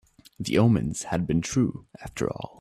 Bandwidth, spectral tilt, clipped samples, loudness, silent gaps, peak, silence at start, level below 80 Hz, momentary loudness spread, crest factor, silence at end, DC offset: 13 kHz; -6 dB/octave; under 0.1%; -26 LUFS; none; -8 dBFS; 0.4 s; -50 dBFS; 14 LU; 18 dB; 0.15 s; under 0.1%